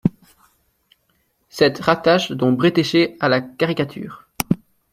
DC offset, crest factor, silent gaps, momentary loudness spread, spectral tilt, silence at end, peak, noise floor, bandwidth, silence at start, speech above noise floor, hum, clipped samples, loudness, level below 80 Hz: under 0.1%; 20 dB; none; 11 LU; -5.5 dB/octave; 0.35 s; 0 dBFS; -65 dBFS; 16 kHz; 0.05 s; 48 dB; none; under 0.1%; -19 LUFS; -54 dBFS